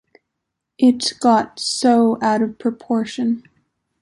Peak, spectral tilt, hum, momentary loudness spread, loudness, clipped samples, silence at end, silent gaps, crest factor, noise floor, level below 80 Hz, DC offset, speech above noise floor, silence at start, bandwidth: -2 dBFS; -4 dB/octave; none; 7 LU; -18 LUFS; under 0.1%; 0.6 s; none; 16 dB; -79 dBFS; -64 dBFS; under 0.1%; 62 dB; 0.8 s; 11.5 kHz